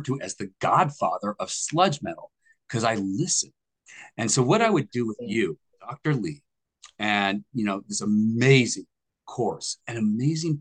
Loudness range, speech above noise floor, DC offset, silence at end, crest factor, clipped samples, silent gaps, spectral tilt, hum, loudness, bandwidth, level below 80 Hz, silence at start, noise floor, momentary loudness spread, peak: 3 LU; 30 dB; under 0.1%; 0 s; 20 dB; under 0.1%; none; -4.5 dB/octave; none; -25 LUFS; 10 kHz; -66 dBFS; 0 s; -55 dBFS; 14 LU; -6 dBFS